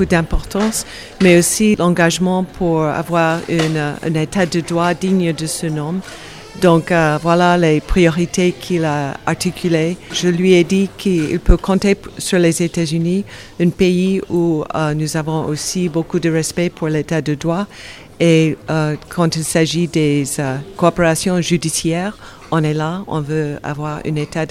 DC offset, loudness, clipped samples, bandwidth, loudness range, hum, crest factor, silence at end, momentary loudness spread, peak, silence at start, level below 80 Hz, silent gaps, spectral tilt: under 0.1%; -16 LUFS; under 0.1%; 15.5 kHz; 3 LU; none; 16 dB; 0 s; 9 LU; 0 dBFS; 0 s; -30 dBFS; none; -5.5 dB/octave